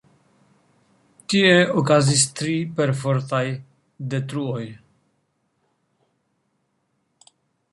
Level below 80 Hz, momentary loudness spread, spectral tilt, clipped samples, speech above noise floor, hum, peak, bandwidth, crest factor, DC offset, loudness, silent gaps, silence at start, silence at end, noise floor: -62 dBFS; 17 LU; -4.5 dB/octave; under 0.1%; 51 dB; none; -2 dBFS; 11.5 kHz; 22 dB; under 0.1%; -20 LUFS; none; 1.3 s; 2.95 s; -71 dBFS